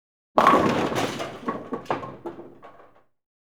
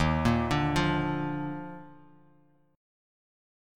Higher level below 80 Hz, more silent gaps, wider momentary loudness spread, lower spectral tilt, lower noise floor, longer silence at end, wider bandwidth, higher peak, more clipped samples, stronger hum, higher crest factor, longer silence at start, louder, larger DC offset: second, -56 dBFS vs -44 dBFS; neither; first, 20 LU vs 15 LU; second, -5 dB/octave vs -6.5 dB/octave; second, -55 dBFS vs -64 dBFS; second, 0.85 s vs 1 s; first, over 20 kHz vs 14 kHz; first, 0 dBFS vs -12 dBFS; neither; neither; first, 26 dB vs 20 dB; first, 0.35 s vs 0 s; first, -24 LUFS vs -29 LUFS; first, 0.2% vs under 0.1%